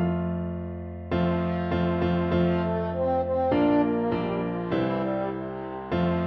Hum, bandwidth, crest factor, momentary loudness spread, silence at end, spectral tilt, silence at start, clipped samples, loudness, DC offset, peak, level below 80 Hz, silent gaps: none; 5.4 kHz; 14 dB; 10 LU; 0 s; -10 dB/octave; 0 s; under 0.1%; -26 LUFS; under 0.1%; -12 dBFS; -46 dBFS; none